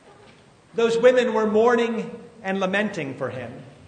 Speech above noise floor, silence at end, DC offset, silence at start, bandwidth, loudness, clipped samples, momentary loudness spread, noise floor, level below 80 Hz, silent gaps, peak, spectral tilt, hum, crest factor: 30 dB; 0.15 s; under 0.1%; 0.75 s; 9.4 kHz; -22 LUFS; under 0.1%; 16 LU; -51 dBFS; -66 dBFS; none; -4 dBFS; -5.5 dB/octave; none; 20 dB